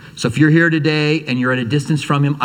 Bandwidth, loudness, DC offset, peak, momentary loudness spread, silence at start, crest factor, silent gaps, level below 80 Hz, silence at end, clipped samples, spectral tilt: 10.5 kHz; -15 LUFS; under 0.1%; 0 dBFS; 6 LU; 0 s; 14 dB; none; -54 dBFS; 0 s; under 0.1%; -6.5 dB/octave